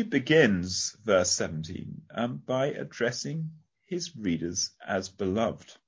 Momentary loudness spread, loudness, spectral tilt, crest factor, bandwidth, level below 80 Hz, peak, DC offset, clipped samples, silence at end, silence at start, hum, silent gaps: 14 LU; -28 LUFS; -4 dB/octave; 22 dB; 8 kHz; -56 dBFS; -6 dBFS; under 0.1%; under 0.1%; 0.15 s; 0 s; none; none